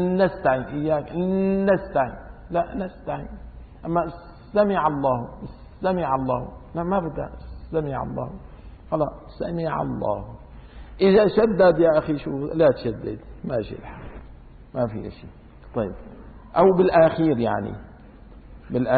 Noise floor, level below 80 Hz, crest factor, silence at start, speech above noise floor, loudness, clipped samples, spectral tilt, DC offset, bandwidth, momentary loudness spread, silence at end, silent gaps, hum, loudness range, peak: -45 dBFS; -44 dBFS; 18 dB; 0 s; 23 dB; -23 LUFS; under 0.1%; -12 dB/octave; under 0.1%; 4.8 kHz; 21 LU; 0 s; none; none; 8 LU; -6 dBFS